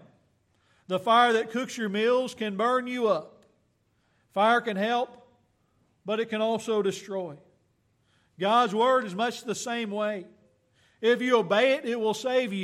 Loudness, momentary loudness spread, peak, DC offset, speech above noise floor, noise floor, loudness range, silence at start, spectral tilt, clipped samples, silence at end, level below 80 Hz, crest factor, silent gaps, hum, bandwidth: -26 LUFS; 11 LU; -10 dBFS; under 0.1%; 44 dB; -70 dBFS; 4 LU; 0.9 s; -4 dB/octave; under 0.1%; 0 s; -80 dBFS; 18 dB; none; none; 14 kHz